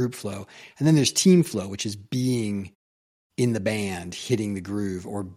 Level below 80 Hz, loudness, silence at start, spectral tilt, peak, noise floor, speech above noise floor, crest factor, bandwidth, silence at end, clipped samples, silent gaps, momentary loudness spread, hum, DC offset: -62 dBFS; -24 LUFS; 0 s; -5 dB/octave; -6 dBFS; under -90 dBFS; over 66 dB; 18 dB; 15.5 kHz; 0 s; under 0.1%; 2.75-3.30 s; 16 LU; none; under 0.1%